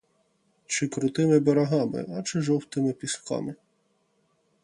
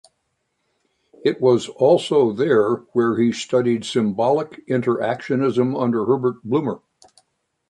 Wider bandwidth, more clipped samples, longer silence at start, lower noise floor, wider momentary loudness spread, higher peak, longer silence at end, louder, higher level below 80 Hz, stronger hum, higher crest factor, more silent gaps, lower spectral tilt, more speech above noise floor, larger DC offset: about the same, 11.5 kHz vs 10.5 kHz; neither; second, 0.7 s vs 1.25 s; about the same, -70 dBFS vs -72 dBFS; first, 11 LU vs 6 LU; second, -8 dBFS vs -4 dBFS; first, 1.1 s vs 0.95 s; second, -26 LUFS vs -20 LUFS; about the same, -68 dBFS vs -64 dBFS; neither; about the same, 18 dB vs 16 dB; neither; about the same, -5.5 dB/octave vs -6.5 dB/octave; second, 45 dB vs 54 dB; neither